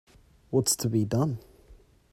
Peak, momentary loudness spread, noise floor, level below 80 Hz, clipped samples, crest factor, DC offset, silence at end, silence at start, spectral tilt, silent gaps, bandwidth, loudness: -12 dBFS; 6 LU; -55 dBFS; -56 dBFS; under 0.1%; 18 dB; under 0.1%; 0.4 s; 0.5 s; -5 dB/octave; none; 16 kHz; -27 LUFS